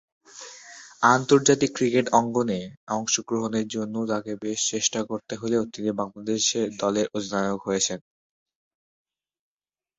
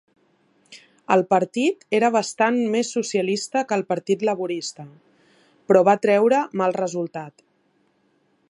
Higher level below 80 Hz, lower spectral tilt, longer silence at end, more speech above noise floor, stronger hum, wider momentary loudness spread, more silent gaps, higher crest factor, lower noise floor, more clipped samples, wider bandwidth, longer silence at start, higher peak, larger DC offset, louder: first, -64 dBFS vs -74 dBFS; second, -3.5 dB/octave vs -5 dB/octave; first, 2 s vs 1.2 s; first, over 66 dB vs 44 dB; neither; about the same, 12 LU vs 12 LU; first, 2.77-2.87 s vs none; about the same, 24 dB vs 20 dB; first, under -90 dBFS vs -65 dBFS; neither; second, 8.4 kHz vs 11.5 kHz; second, 0.35 s vs 0.7 s; about the same, -2 dBFS vs -4 dBFS; neither; second, -24 LUFS vs -21 LUFS